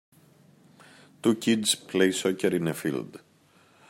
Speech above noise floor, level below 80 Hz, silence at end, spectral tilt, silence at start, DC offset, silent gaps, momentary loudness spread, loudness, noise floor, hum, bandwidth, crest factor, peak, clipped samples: 34 dB; -74 dBFS; 0.75 s; -4 dB/octave; 1.25 s; under 0.1%; none; 8 LU; -26 LUFS; -60 dBFS; none; 16 kHz; 22 dB; -8 dBFS; under 0.1%